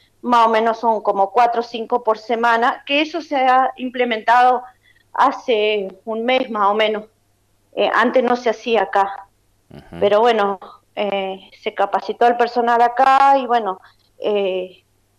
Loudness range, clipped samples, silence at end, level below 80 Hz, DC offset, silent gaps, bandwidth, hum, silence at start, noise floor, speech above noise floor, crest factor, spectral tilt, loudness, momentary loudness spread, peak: 3 LU; under 0.1%; 0.5 s; -62 dBFS; under 0.1%; none; 11.5 kHz; none; 0.25 s; -61 dBFS; 44 dB; 14 dB; -4.5 dB/octave; -17 LUFS; 13 LU; -4 dBFS